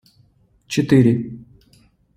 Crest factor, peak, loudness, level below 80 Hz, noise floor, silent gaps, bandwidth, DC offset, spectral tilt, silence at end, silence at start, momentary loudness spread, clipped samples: 18 dB; -2 dBFS; -17 LUFS; -52 dBFS; -57 dBFS; none; 15 kHz; under 0.1%; -7 dB/octave; 0.75 s; 0.7 s; 20 LU; under 0.1%